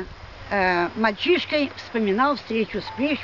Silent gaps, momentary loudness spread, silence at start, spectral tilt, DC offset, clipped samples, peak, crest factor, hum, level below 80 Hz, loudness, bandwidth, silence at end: none; 7 LU; 0 s; -6 dB/octave; 0.2%; under 0.1%; -6 dBFS; 18 dB; none; -50 dBFS; -23 LUFS; 6 kHz; 0 s